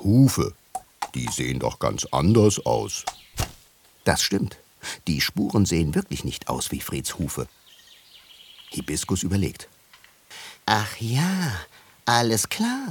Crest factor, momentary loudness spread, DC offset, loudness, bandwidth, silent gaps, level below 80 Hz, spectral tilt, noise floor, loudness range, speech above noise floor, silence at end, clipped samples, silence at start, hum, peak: 24 dB; 15 LU; under 0.1%; -24 LUFS; 19 kHz; none; -44 dBFS; -4.5 dB/octave; -55 dBFS; 6 LU; 32 dB; 0 s; under 0.1%; 0 s; none; -2 dBFS